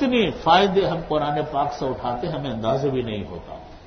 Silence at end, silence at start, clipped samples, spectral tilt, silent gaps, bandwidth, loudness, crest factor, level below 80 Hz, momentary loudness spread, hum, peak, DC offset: 0 s; 0 s; under 0.1%; -6.5 dB/octave; none; 6.4 kHz; -22 LUFS; 20 dB; -44 dBFS; 14 LU; none; -2 dBFS; under 0.1%